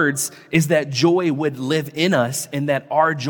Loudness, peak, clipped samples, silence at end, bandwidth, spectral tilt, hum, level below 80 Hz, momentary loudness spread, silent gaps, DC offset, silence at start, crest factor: -19 LUFS; -2 dBFS; under 0.1%; 0 s; 17.5 kHz; -4.5 dB/octave; none; -62 dBFS; 5 LU; none; under 0.1%; 0 s; 16 dB